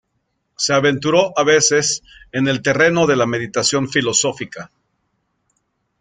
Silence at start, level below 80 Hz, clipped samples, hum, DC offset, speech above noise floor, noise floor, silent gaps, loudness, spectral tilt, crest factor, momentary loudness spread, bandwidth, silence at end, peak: 0.6 s; -56 dBFS; under 0.1%; none; under 0.1%; 53 dB; -70 dBFS; none; -16 LUFS; -3 dB/octave; 16 dB; 11 LU; 9.8 kHz; 1.35 s; -2 dBFS